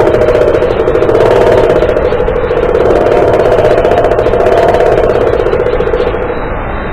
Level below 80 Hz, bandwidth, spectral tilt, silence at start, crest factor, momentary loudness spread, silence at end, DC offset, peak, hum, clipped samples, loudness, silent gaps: -22 dBFS; 11 kHz; -7 dB/octave; 0 s; 8 dB; 5 LU; 0 s; under 0.1%; 0 dBFS; none; 1%; -9 LUFS; none